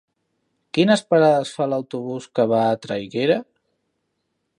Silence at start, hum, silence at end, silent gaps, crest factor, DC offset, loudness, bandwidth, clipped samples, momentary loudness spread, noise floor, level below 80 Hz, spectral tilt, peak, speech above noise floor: 0.75 s; none; 1.15 s; none; 18 dB; under 0.1%; -20 LUFS; 11.5 kHz; under 0.1%; 11 LU; -74 dBFS; -66 dBFS; -6 dB/octave; -4 dBFS; 55 dB